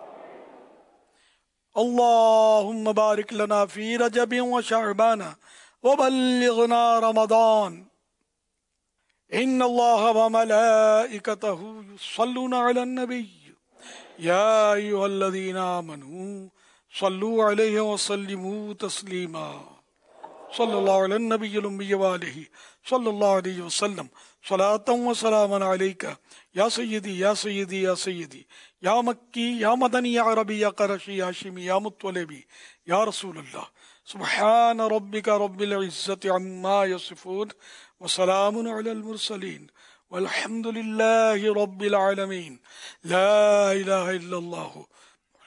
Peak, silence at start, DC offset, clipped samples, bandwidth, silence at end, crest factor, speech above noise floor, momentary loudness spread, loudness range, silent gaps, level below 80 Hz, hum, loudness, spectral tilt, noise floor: -10 dBFS; 0 s; under 0.1%; under 0.1%; 11 kHz; 0.65 s; 14 dB; 55 dB; 17 LU; 5 LU; none; -80 dBFS; none; -23 LUFS; -4 dB/octave; -78 dBFS